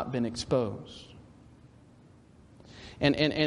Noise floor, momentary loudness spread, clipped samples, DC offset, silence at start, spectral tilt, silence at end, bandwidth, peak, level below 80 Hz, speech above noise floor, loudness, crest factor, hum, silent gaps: -56 dBFS; 26 LU; under 0.1%; under 0.1%; 0 s; -5.5 dB/octave; 0 s; 11 kHz; -10 dBFS; -56 dBFS; 28 dB; -29 LUFS; 22 dB; none; none